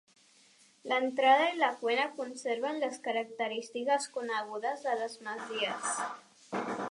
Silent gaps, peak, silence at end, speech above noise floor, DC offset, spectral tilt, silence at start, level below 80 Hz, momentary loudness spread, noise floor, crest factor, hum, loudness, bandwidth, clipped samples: none; -12 dBFS; 0 s; 31 dB; under 0.1%; -2 dB/octave; 0.85 s; -90 dBFS; 13 LU; -63 dBFS; 20 dB; none; -32 LUFS; 11.5 kHz; under 0.1%